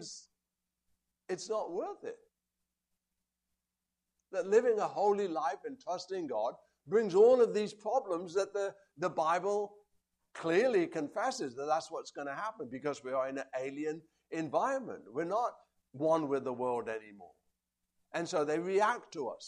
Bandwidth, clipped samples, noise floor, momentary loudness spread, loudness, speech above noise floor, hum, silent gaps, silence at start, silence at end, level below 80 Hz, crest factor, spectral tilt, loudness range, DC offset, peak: 10.5 kHz; under 0.1%; -89 dBFS; 13 LU; -34 LUFS; 56 dB; none; none; 0 s; 0 s; -82 dBFS; 20 dB; -5 dB/octave; 7 LU; under 0.1%; -16 dBFS